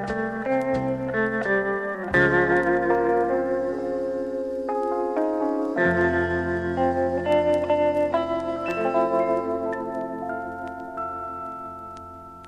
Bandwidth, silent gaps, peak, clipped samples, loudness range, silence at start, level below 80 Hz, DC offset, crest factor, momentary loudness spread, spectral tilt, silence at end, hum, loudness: 10.5 kHz; none; -8 dBFS; under 0.1%; 4 LU; 0 s; -50 dBFS; under 0.1%; 16 dB; 11 LU; -7.5 dB/octave; 0 s; none; -24 LUFS